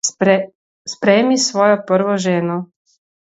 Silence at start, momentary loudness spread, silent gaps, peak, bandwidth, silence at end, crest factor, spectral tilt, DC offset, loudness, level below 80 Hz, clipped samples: 0.05 s; 17 LU; 0.55-0.85 s; 0 dBFS; 8 kHz; 0.6 s; 16 dB; -4 dB/octave; under 0.1%; -16 LUFS; -66 dBFS; under 0.1%